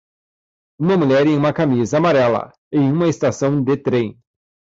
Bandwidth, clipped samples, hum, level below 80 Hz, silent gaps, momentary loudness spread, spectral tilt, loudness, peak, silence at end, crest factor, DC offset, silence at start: 7.8 kHz; under 0.1%; none; -54 dBFS; 2.58-2.71 s; 7 LU; -7 dB/octave; -17 LUFS; -6 dBFS; 0.6 s; 12 dB; under 0.1%; 0.8 s